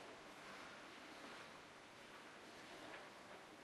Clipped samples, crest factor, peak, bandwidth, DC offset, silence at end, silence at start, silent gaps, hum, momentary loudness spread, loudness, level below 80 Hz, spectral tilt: under 0.1%; 16 dB; -42 dBFS; 13.5 kHz; under 0.1%; 0 s; 0 s; none; none; 3 LU; -57 LUFS; -84 dBFS; -2.5 dB/octave